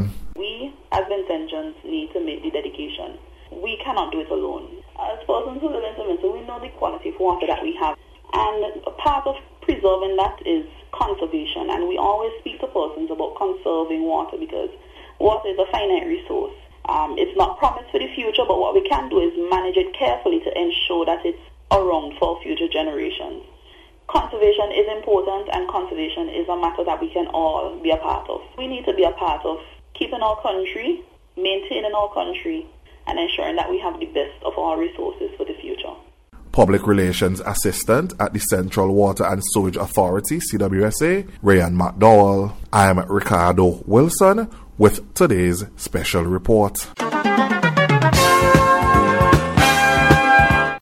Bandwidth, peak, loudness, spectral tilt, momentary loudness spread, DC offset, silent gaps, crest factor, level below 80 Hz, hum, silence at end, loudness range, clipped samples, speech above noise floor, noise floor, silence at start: 16 kHz; 0 dBFS; -20 LUFS; -5 dB/octave; 14 LU; under 0.1%; none; 20 dB; -38 dBFS; none; 0 s; 9 LU; under 0.1%; 27 dB; -48 dBFS; 0 s